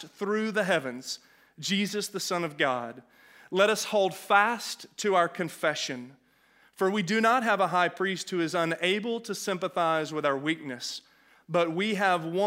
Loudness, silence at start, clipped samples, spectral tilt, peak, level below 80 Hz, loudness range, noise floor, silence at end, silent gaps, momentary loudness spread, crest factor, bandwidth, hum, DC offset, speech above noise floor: -28 LUFS; 0 s; under 0.1%; -4 dB/octave; -8 dBFS; -82 dBFS; 3 LU; -63 dBFS; 0 s; none; 11 LU; 22 dB; 16 kHz; none; under 0.1%; 35 dB